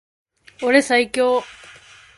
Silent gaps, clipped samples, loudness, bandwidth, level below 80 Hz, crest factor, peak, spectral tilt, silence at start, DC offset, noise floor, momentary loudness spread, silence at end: none; under 0.1%; -18 LUFS; 11.5 kHz; -60 dBFS; 20 dB; 0 dBFS; -2.5 dB/octave; 0.6 s; under 0.1%; -46 dBFS; 10 LU; 0.65 s